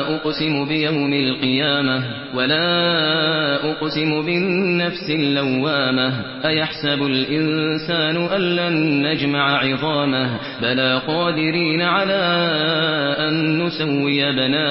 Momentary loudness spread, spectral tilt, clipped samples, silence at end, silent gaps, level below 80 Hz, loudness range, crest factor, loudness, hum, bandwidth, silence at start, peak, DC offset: 4 LU; -10 dB/octave; under 0.1%; 0 s; none; -58 dBFS; 1 LU; 14 dB; -18 LUFS; none; 5.8 kHz; 0 s; -4 dBFS; under 0.1%